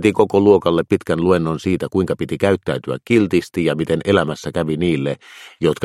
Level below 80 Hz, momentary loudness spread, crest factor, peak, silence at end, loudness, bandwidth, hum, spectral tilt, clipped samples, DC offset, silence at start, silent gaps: -48 dBFS; 8 LU; 18 dB; 0 dBFS; 0 s; -18 LUFS; 13.5 kHz; none; -7 dB/octave; under 0.1%; under 0.1%; 0 s; none